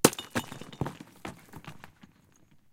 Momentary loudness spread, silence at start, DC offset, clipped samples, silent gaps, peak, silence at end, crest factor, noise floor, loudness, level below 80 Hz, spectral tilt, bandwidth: 15 LU; 0.05 s; under 0.1%; under 0.1%; none; -2 dBFS; 0.85 s; 32 dB; -61 dBFS; -35 LUFS; -60 dBFS; -3.5 dB/octave; 16.5 kHz